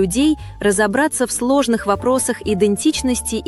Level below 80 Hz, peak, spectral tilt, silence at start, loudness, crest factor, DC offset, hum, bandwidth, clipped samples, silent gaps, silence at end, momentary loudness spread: -38 dBFS; -4 dBFS; -4 dB/octave; 0 s; -17 LUFS; 14 dB; under 0.1%; none; 13.5 kHz; under 0.1%; none; 0 s; 3 LU